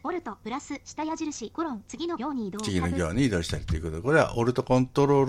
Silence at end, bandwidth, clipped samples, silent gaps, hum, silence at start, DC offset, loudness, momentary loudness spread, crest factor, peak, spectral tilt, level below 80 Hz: 0 s; 14 kHz; under 0.1%; none; none; 0.05 s; under 0.1%; -28 LUFS; 12 LU; 18 dB; -8 dBFS; -6 dB/octave; -44 dBFS